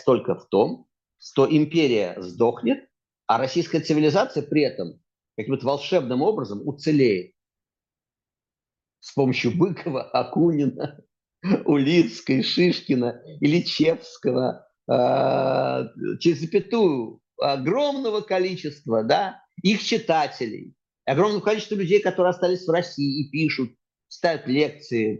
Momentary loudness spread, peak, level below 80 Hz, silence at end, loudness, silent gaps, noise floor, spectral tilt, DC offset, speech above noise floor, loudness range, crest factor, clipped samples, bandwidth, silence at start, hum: 10 LU; -6 dBFS; -68 dBFS; 0 s; -23 LUFS; none; under -90 dBFS; -6.5 dB/octave; under 0.1%; over 68 dB; 3 LU; 18 dB; under 0.1%; 7.6 kHz; 0.05 s; none